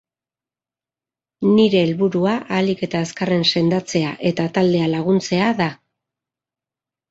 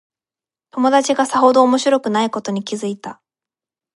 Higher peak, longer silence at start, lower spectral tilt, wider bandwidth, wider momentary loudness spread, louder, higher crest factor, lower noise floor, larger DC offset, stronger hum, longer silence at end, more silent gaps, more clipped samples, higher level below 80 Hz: about the same, -4 dBFS vs -2 dBFS; first, 1.4 s vs 0.75 s; first, -6 dB/octave vs -4 dB/octave; second, 8 kHz vs 11.5 kHz; second, 7 LU vs 15 LU; about the same, -18 LUFS vs -16 LUFS; about the same, 16 dB vs 16 dB; about the same, under -90 dBFS vs under -90 dBFS; neither; neither; first, 1.35 s vs 0.85 s; neither; neither; first, -58 dBFS vs -72 dBFS